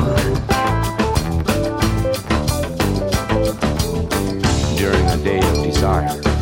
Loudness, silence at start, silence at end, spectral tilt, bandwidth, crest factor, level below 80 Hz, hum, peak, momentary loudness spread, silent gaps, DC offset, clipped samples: -18 LUFS; 0 s; 0 s; -5.5 dB/octave; 17 kHz; 14 dB; -26 dBFS; none; -4 dBFS; 3 LU; none; under 0.1%; under 0.1%